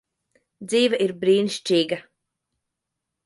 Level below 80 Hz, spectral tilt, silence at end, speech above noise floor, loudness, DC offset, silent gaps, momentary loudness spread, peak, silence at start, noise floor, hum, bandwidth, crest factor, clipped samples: -74 dBFS; -4.5 dB/octave; 1.25 s; 62 dB; -22 LUFS; under 0.1%; none; 9 LU; -8 dBFS; 0.6 s; -83 dBFS; none; 11.5 kHz; 16 dB; under 0.1%